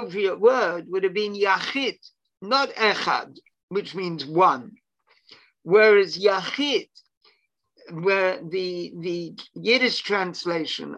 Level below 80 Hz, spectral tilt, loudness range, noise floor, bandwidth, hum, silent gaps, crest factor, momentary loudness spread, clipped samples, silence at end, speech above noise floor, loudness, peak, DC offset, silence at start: -76 dBFS; -4.5 dB/octave; 4 LU; -67 dBFS; 8.6 kHz; none; 3.63-3.68 s, 7.17-7.21 s; 20 dB; 12 LU; under 0.1%; 0 s; 44 dB; -22 LUFS; -4 dBFS; under 0.1%; 0 s